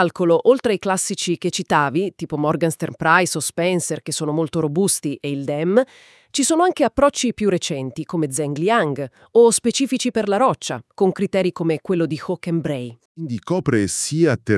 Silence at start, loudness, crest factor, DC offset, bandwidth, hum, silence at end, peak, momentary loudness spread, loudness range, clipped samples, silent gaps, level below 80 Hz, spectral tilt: 0 s; -20 LUFS; 20 dB; under 0.1%; 12 kHz; none; 0 s; 0 dBFS; 10 LU; 3 LU; under 0.1%; 13.05-13.15 s; -54 dBFS; -4.5 dB/octave